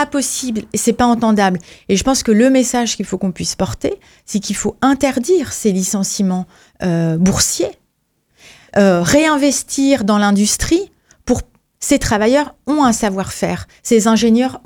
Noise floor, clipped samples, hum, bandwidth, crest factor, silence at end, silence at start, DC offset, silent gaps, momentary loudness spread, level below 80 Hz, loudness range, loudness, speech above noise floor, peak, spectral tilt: -65 dBFS; under 0.1%; none; 18.5 kHz; 14 dB; 0.1 s; 0 s; under 0.1%; none; 10 LU; -38 dBFS; 3 LU; -15 LUFS; 50 dB; 0 dBFS; -4.5 dB/octave